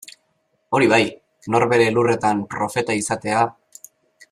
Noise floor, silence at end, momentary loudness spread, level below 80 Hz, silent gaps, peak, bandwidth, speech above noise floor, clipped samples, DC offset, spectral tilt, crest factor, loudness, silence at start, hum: -68 dBFS; 0.8 s; 8 LU; -60 dBFS; none; -4 dBFS; 14.5 kHz; 49 dB; under 0.1%; under 0.1%; -5 dB/octave; 18 dB; -19 LUFS; 0.7 s; none